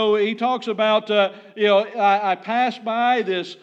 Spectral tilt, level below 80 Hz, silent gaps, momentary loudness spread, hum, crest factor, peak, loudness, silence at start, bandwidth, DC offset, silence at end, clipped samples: -5 dB/octave; under -90 dBFS; none; 5 LU; none; 14 dB; -6 dBFS; -20 LUFS; 0 s; 8 kHz; under 0.1%; 0.1 s; under 0.1%